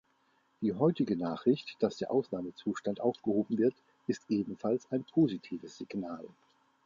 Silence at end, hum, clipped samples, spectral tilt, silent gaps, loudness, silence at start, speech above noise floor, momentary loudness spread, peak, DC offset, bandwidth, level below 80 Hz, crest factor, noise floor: 0.6 s; none; under 0.1%; -7.5 dB/octave; none; -33 LUFS; 0.6 s; 40 dB; 12 LU; -14 dBFS; under 0.1%; 7.4 kHz; -72 dBFS; 20 dB; -72 dBFS